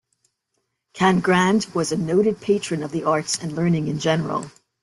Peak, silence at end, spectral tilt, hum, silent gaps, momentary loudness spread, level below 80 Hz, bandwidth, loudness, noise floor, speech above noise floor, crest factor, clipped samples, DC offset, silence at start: -4 dBFS; 0.35 s; -5 dB/octave; none; none; 8 LU; -58 dBFS; 12 kHz; -21 LUFS; -75 dBFS; 54 dB; 18 dB; under 0.1%; under 0.1%; 0.95 s